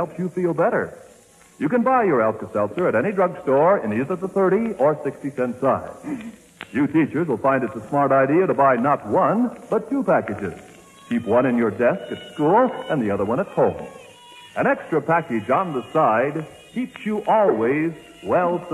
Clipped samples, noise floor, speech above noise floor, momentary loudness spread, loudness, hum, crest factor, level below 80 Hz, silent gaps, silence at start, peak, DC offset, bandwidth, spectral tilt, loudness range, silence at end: under 0.1%; -50 dBFS; 30 dB; 12 LU; -21 LUFS; none; 16 dB; -60 dBFS; none; 0 s; -6 dBFS; under 0.1%; 13.5 kHz; -8 dB/octave; 3 LU; 0 s